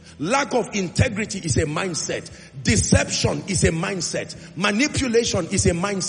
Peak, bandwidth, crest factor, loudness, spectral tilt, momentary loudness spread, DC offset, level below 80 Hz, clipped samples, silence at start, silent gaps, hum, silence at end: -2 dBFS; 10 kHz; 20 dB; -21 LUFS; -4 dB/octave; 8 LU; under 0.1%; -40 dBFS; under 0.1%; 0.05 s; none; none; 0 s